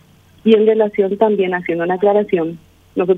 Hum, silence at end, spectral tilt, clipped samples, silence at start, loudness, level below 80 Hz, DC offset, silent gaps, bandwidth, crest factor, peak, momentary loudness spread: none; 0 s; -8.5 dB/octave; under 0.1%; 0.45 s; -16 LUFS; -58 dBFS; under 0.1%; none; 4 kHz; 14 dB; 0 dBFS; 9 LU